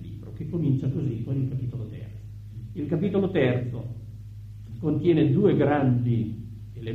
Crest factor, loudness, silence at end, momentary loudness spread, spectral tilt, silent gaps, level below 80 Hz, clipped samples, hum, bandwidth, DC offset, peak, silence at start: 18 dB; -25 LUFS; 0 s; 20 LU; -10 dB/octave; none; -50 dBFS; under 0.1%; none; 4.3 kHz; under 0.1%; -8 dBFS; 0 s